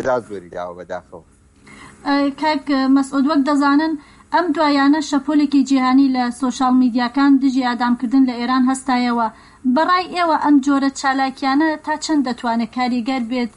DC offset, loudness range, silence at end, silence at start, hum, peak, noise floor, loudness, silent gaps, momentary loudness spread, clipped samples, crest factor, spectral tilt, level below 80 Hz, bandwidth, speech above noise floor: under 0.1%; 3 LU; 0.1 s; 0 s; none; -6 dBFS; -44 dBFS; -17 LUFS; none; 8 LU; under 0.1%; 12 dB; -4 dB/octave; -54 dBFS; 11 kHz; 28 dB